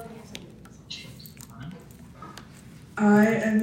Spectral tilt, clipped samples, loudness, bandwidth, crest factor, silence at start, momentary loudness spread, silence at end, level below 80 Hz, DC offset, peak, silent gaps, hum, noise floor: -6.5 dB/octave; under 0.1%; -21 LUFS; 15.5 kHz; 18 dB; 0 s; 27 LU; 0 s; -58 dBFS; under 0.1%; -8 dBFS; none; none; -47 dBFS